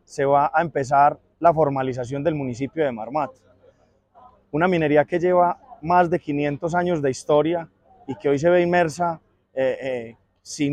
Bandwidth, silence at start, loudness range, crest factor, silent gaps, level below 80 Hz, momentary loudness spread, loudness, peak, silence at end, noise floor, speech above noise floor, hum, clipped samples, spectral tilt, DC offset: 10.5 kHz; 0.1 s; 4 LU; 18 dB; none; -56 dBFS; 12 LU; -21 LUFS; -4 dBFS; 0 s; -58 dBFS; 37 dB; none; under 0.1%; -6.5 dB/octave; under 0.1%